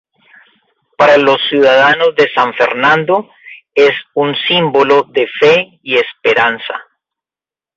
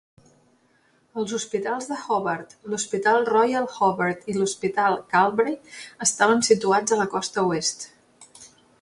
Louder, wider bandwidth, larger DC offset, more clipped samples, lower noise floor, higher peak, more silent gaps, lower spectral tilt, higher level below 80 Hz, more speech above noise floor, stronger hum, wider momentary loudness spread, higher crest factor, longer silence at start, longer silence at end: first, -11 LUFS vs -23 LUFS; second, 7.4 kHz vs 11.5 kHz; neither; neither; first, under -90 dBFS vs -63 dBFS; first, 0 dBFS vs -4 dBFS; neither; first, -5 dB/octave vs -3 dB/octave; first, -58 dBFS vs -66 dBFS; first, over 79 dB vs 40 dB; neither; second, 8 LU vs 12 LU; second, 12 dB vs 20 dB; second, 1 s vs 1.15 s; first, 0.95 s vs 0.35 s